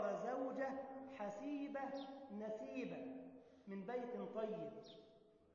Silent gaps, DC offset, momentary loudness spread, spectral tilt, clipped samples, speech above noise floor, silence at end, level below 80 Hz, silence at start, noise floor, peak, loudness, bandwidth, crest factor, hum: none; under 0.1%; 14 LU; -5 dB/octave; under 0.1%; 21 dB; 0.1 s; -86 dBFS; 0 s; -69 dBFS; -32 dBFS; -48 LUFS; 7 kHz; 14 dB; none